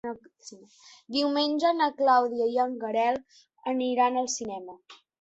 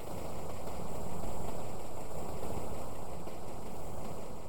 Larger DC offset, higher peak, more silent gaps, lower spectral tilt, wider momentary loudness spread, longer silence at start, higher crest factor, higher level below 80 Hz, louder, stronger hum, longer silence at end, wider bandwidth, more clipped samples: second, under 0.1% vs 3%; first, -10 dBFS vs -22 dBFS; neither; second, -2.5 dB/octave vs -5.5 dB/octave; first, 19 LU vs 4 LU; about the same, 0.05 s vs 0 s; about the same, 16 dB vs 14 dB; second, -72 dBFS vs -50 dBFS; first, -26 LUFS vs -43 LUFS; neither; first, 0.3 s vs 0 s; second, 8.2 kHz vs over 20 kHz; neither